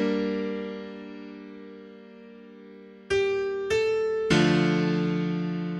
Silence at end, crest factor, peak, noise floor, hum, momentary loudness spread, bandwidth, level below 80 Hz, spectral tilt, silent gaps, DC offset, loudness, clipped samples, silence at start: 0 s; 20 dB; -8 dBFS; -47 dBFS; none; 25 LU; 11.5 kHz; -56 dBFS; -6.5 dB/octave; none; under 0.1%; -26 LUFS; under 0.1%; 0 s